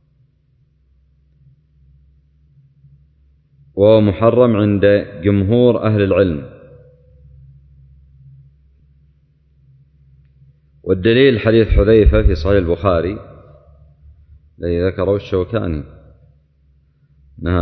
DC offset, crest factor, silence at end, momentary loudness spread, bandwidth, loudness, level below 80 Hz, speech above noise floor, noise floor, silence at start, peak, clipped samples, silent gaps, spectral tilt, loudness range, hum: under 0.1%; 16 dB; 0 s; 16 LU; 6 kHz; -15 LUFS; -28 dBFS; 44 dB; -57 dBFS; 3.75 s; 0 dBFS; under 0.1%; none; -9.5 dB/octave; 8 LU; none